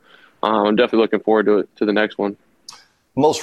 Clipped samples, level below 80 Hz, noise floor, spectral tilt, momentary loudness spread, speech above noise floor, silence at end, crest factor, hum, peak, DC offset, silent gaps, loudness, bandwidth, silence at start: under 0.1%; -62 dBFS; -44 dBFS; -5 dB/octave; 9 LU; 27 dB; 0 s; 16 dB; none; -2 dBFS; under 0.1%; none; -18 LUFS; 12.5 kHz; 0.45 s